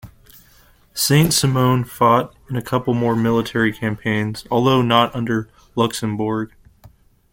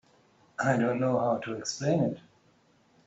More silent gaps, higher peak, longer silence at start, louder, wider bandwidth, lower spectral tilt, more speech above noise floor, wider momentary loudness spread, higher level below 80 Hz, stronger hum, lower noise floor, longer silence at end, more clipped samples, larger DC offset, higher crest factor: neither; first, -2 dBFS vs -12 dBFS; second, 0.05 s vs 0.6 s; first, -18 LUFS vs -29 LUFS; first, 17 kHz vs 8.2 kHz; about the same, -5 dB/octave vs -5.5 dB/octave; about the same, 34 dB vs 37 dB; about the same, 10 LU vs 8 LU; first, -48 dBFS vs -68 dBFS; neither; second, -52 dBFS vs -65 dBFS; about the same, 0.85 s vs 0.9 s; neither; neither; about the same, 18 dB vs 18 dB